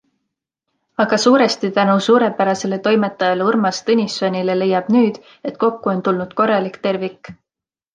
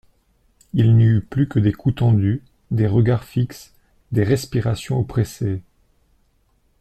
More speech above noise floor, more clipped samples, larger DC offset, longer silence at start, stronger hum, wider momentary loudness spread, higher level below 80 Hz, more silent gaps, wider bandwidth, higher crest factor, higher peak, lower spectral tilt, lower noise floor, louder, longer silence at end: first, 71 dB vs 44 dB; neither; neither; first, 1 s vs 0.75 s; neither; about the same, 8 LU vs 10 LU; second, -64 dBFS vs -44 dBFS; neither; second, 9.6 kHz vs 13 kHz; about the same, 16 dB vs 14 dB; first, -2 dBFS vs -6 dBFS; second, -5 dB/octave vs -8 dB/octave; first, -88 dBFS vs -62 dBFS; first, -17 LUFS vs -20 LUFS; second, 0.6 s vs 1.2 s